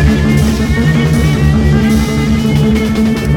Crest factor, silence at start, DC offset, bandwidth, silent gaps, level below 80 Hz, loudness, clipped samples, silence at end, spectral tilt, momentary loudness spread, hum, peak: 10 dB; 0 s; under 0.1%; 17 kHz; none; -18 dBFS; -11 LUFS; under 0.1%; 0 s; -6.5 dB/octave; 2 LU; none; 0 dBFS